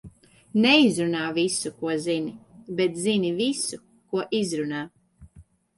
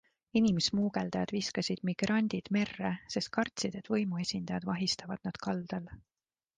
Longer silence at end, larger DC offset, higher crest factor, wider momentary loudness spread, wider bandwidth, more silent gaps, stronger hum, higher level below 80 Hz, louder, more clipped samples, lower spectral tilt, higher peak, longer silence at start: second, 0.35 s vs 0.6 s; neither; about the same, 20 dB vs 18 dB; first, 14 LU vs 8 LU; first, 11.5 kHz vs 9.6 kHz; neither; neither; about the same, -62 dBFS vs -64 dBFS; first, -24 LUFS vs -33 LUFS; neither; about the same, -4 dB/octave vs -5 dB/octave; first, -6 dBFS vs -16 dBFS; second, 0.05 s vs 0.35 s